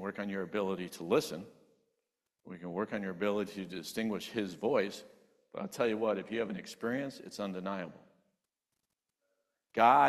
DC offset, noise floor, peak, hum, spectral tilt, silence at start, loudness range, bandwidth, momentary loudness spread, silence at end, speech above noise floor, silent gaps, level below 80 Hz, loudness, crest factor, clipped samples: under 0.1%; -87 dBFS; -12 dBFS; none; -5 dB/octave; 0 s; 4 LU; 14 kHz; 12 LU; 0 s; 53 dB; none; -76 dBFS; -35 LUFS; 24 dB; under 0.1%